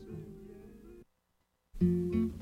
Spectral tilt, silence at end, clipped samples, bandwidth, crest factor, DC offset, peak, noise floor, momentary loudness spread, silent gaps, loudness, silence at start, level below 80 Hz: -10 dB/octave; 0 s; under 0.1%; 5.4 kHz; 18 dB; under 0.1%; -18 dBFS; -78 dBFS; 24 LU; none; -32 LUFS; 0 s; -52 dBFS